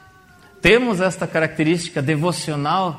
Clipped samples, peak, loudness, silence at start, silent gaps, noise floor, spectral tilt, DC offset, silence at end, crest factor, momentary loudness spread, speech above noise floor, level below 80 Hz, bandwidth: under 0.1%; 0 dBFS; -19 LUFS; 0.65 s; none; -48 dBFS; -5 dB/octave; under 0.1%; 0 s; 20 dB; 7 LU; 30 dB; -46 dBFS; 15.5 kHz